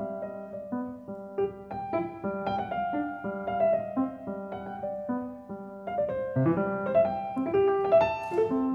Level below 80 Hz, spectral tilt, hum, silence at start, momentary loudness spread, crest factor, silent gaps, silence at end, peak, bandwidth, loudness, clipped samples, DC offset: -60 dBFS; -9 dB/octave; none; 0 s; 13 LU; 18 dB; none; 0 s; -12 dBFS; 6.8 kHz; -30 LUFS; under 0.1%; under 0.1%